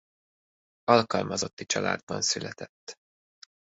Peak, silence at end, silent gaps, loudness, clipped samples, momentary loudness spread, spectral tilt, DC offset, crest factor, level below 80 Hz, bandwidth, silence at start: -4 dBFS; 0.7 s; 1.53-1.57 s, 2.03-2.07 s, 2.69-2.87 s; -27 LUFS; under 0.1%; 20 LU; -3 dB/octave; under 0.1%; 26 dB; -64 dBFS; 8.4 kHz; 0.85 s